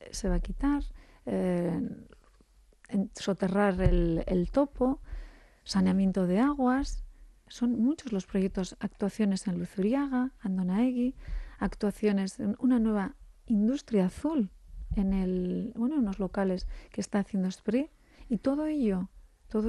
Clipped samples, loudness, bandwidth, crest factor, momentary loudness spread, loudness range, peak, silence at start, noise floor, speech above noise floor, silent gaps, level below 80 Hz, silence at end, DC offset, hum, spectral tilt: under 0.1%; -30 LUFS; 12 kHz; 18 dB; 11 LU; 3 LU; -12 dBFS; 0 s; -61 dBFS; 32 dB; none; -42 dBFS; 0 s; under 0.1%; none; -7 dB/octave